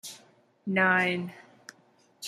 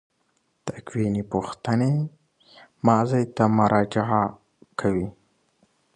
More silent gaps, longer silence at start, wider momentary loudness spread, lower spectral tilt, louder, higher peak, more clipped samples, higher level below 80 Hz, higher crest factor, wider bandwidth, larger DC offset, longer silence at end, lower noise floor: neither; second, 0.05 s vs 0.65 s; first, 21 LU vs 15 LU; second, -4.5 dB/octave vs -7.5 dB/octave; about the same, -26 LUFS vs -24 LUFS; second, -10 dBFS vs -4 dBFS; neither; second, -78 dBFS vs -54 dBFS; about the same, 20 dB vs 22 dB; first, 15 kHz vs 9.8 kHz; neither; second, 0 s vs 0.85 s; second, -63 dBFS vs -70 dBFS